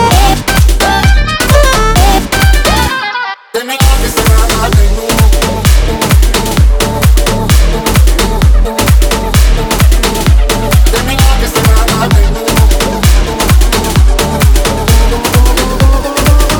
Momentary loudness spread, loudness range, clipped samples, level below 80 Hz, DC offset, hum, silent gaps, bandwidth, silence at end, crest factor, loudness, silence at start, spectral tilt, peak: 2 LU; 1 LU; 1%; -10 dBFS; under 0.1%; none; none; over 20 kHz; 0 s; 8 dB; -9 LUFS; 0 s; -4.5 dB/octave; 0 dBFS